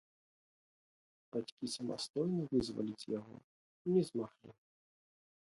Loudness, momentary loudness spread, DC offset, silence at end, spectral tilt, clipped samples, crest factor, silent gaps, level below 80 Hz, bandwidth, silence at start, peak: -39 LUFS; 11 LU; under 0.1%; 1.1 s; -6.5 dB/octave; under 0.1%; 20 dB; 1.52-1.57 s, 2.10-2.14 s, 3.44-3.85 s; -72 dBFS; 11.5 kHz; 1.35 s; -22 dBFS